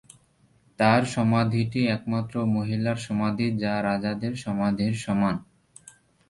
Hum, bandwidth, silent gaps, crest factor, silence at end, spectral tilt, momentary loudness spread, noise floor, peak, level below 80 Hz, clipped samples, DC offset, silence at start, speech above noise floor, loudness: none; 11.5 kHz; none; 20 dB; 0.85 s; -6.5 dB/octave; 6 LU; -62 dBFS; -6 dBFS; -56 dBFS; under 0.1%; under 0.1%; 0.8 s; 38 dB; -25 LUFS